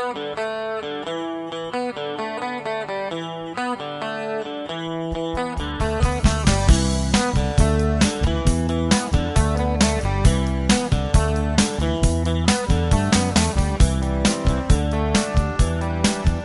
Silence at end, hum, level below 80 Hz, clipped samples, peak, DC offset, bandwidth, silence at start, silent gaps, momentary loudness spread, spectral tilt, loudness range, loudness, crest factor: 0 s; none; -24 dBFS; under 0.1%; -2 dBFS; under 0.1%; 11.5 kHz; 0 s; none; 9 LU; -5 dB/octave; 7 LU; -21 LUFS; 18 dB